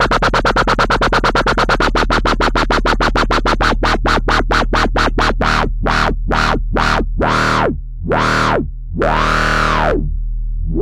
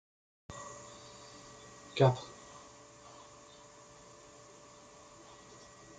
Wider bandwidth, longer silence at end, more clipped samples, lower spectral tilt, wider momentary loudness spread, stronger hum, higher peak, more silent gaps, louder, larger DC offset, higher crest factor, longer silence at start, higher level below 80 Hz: first, 11.5 kHz vs 9.4 kHz; about the same, 0 s vs 0 s; neither; about the same, -5 dB/octave vs -6 dB/octave; second, 6 LU vs 26 LU; neither; first, 0 dBFS vs -14 dBFS; neither; first, -15 LUFS vs -34 LUFS; neither; second, 14 dB vs 26 dB; second, 0 s vs 0.5 s; first, -20 dBFS vs -70 dBFS